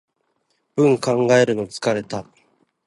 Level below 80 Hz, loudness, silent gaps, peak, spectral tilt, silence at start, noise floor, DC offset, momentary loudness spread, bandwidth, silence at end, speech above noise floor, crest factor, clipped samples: -60 dBFS; -19 LUFS; none; -2 dBFS; -5.5 dB/octave; 0.75 s; -69 dBFS; under 0.1%; 14 LU; 11.5 kHz; 0.65 s; 51 dB; 18 dB; under 0.1%